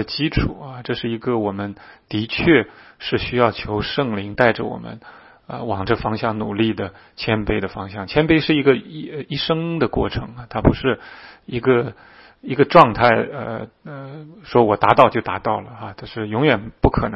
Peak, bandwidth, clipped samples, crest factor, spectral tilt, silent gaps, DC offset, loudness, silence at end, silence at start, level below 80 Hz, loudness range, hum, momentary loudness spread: 0 dBFS; 6.6 kHz; under 0.1%; 20 dB; -8.5 dB/octave; none; under 0.1%; -19 LUFS; 0 s; 0 s; -38 dBFS; 5 LU; none; 17 LU